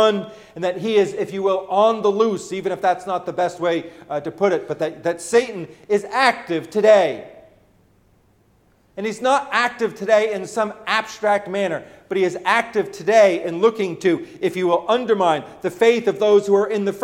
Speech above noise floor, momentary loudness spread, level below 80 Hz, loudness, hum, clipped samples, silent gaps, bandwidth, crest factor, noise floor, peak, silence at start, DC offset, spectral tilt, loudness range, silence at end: 39 dB; 10 LU; -64 dBFS; -19 LUFS; none; under 0.1%; none; 15 kHz; 18 dB; -58 dBFS; -2 dBFS; 0 s; under 0.1%; -4.5 dB/octave; 4 LU; 0 s